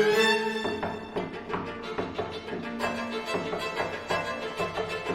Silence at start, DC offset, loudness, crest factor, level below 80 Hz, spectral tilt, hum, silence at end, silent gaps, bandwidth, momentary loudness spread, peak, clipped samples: 0 s; under 0.1%; -30 LUFS; 18 dB; -58 dBFS; -4 dB/octave; none; 0 s; none; 17 kHz; 10 LU; -12 dBFS; under 0.1%